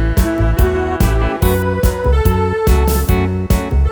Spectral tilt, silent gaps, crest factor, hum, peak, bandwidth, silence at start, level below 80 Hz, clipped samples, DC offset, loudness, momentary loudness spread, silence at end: -6.5 dB/octave; none; 12 dB; none; 0 dBFS; over 20 kHz; 0 s; -16 dBFS; under 0.1%; under 0.1%; -15 LUFS; 2 LU; 0 s